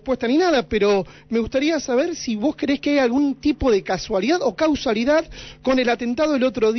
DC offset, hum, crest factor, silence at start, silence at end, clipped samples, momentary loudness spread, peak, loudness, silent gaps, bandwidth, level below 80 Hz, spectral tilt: under 0.1%; none; 12 dB; 0.05 s; 0 s; under 0.1%; 5 LU; -8 dBFS; -20 LUFS; none; 6.4 kHz; -44 dBFS; -5 dB/octave